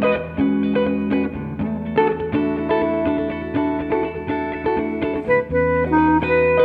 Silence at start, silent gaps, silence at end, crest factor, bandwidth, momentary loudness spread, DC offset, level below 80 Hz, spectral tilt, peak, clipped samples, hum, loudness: 0 s; none; 0 s; 14 dB; 4.9 kHz; 8 LU; under 0.1%; -40 dBFS; -9.5 dB/octave; -4 dBFS; under 0.1%; none; -20 LUFS